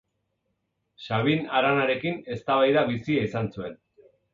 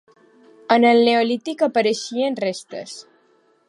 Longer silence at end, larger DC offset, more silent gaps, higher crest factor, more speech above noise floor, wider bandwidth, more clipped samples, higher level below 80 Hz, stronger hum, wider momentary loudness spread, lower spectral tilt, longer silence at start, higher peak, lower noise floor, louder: about the same, 0.6 s vs 0.7 s; neither; neither; about the same, 18 dB vs 20 dB; first, 52 dB vs 41 dB; second, 7.4 kHz vs 11.5 kHz; neither; first, -60 dBFS vs -76 dBFS; neither; second, 12 LU vs 19 LU; first, -7.5 dB/octave vs -4 dB/octave; first, 1 s vs 0.7 s; second, -10 dBFS vs -2 dBFS; first, -77 dBFS vs -59 dBFS; second, -25 LUFS vs -18 LUFS